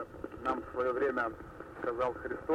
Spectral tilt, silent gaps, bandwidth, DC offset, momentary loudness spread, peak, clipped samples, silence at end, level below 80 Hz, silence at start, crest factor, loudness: -7 dB/octave; none; 13 kHz; under 0.1%; 12 LU; -20 dBFS; under 0.1%; 0 s; -58 dBFS; 0 s; 16 dB; -35 LUFS